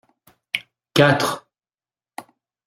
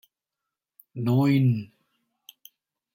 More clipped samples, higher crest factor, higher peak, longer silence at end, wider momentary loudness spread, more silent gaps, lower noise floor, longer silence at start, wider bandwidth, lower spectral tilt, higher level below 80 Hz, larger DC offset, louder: neither; first, 22 dB vs 16 dB; first, -2 dBFS vs -12 dBFS; second, 0.45 s vs 1.3 s; about the same, 24 LU vs 22 LU; neither; about the same, under -90 dBFS vs -87 dBFS; second, 0.55 s vs 0.95 s; about the same, 16 kHz vs 16 kHz; second, -5 dB/octave vs -8.5 dB/octave; first, -60 dBFS vs -66 dBFS; neither; first, -20 LUFS vs -24 LUFS